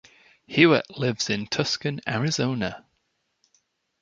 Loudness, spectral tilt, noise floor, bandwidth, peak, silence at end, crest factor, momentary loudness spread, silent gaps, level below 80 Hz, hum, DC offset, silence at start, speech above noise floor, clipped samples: -24 LUFS; -4.5 dB/octave; -74 dBFS; 8.6 kHz; -2 dBFS; 1.2 s; 24 dB; 11 LU; none; -60 dBFS; none; under 0.1%; 0.5 s; 50 dB; under 0.1%